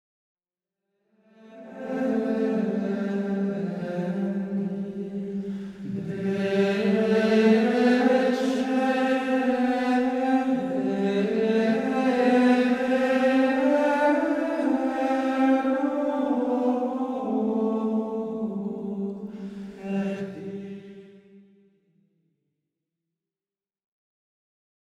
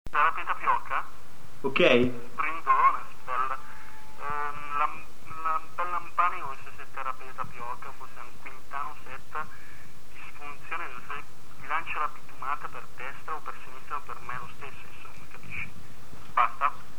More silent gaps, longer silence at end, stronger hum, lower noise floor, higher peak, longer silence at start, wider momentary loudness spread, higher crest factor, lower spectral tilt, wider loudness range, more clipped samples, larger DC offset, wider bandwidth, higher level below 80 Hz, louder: neither; first, 3.6 s vs 0 s; neither; first, under -90 dBFS vs -49 dBFS; about the same, -8 dBFS vs -6 dBFS; first, 1.45 s vs 0.05 s; second, 13 LU vs 21 LU; second, 18 dB vs 24 dB; first, -7 dB/octave vs -5 dB/octave; about the same, 11 LU vs 13 LU; neither; second, under 0.1% vs 5%; second, 11.5 kHz vs over 20 kHz; second, -66 dBFS vs -56 dBFS; first, -25 LUFS vs -30 LUFS